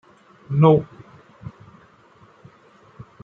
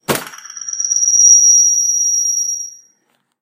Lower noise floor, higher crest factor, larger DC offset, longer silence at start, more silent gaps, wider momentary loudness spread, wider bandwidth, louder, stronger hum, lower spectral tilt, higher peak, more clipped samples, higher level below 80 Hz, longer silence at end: second, -52 dBFS vs -63 dBFS; first, 22 dB vs 14 dB; neither; first, 0.5 s vs 0.1 s; neither; first, 26 LU vs 20 LU; second, 3.8 kHz vs 16 kHz; second, -18 LUFS vs -9 LUFS; neither; first, -10.5 dB/octave vs 1 dB/octave; about the same, -2 dBFS vs 0 dBFS; neither; about the same, -58 dBFS vs -62 dBFS; second, 0.2 s vs 0.7 s